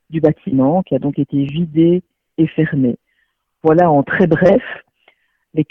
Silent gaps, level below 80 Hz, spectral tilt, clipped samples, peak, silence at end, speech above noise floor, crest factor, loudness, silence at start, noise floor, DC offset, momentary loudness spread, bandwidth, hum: none; -48 dBFS; -10 dB/octave; under 0.1%; 0 dBFS; 0.05 s; 52 dB; 16 dB; -15 LUFS; 0.1 s; -66 dBFS; under 0.1%; 11 LU; 6.2 kHz; none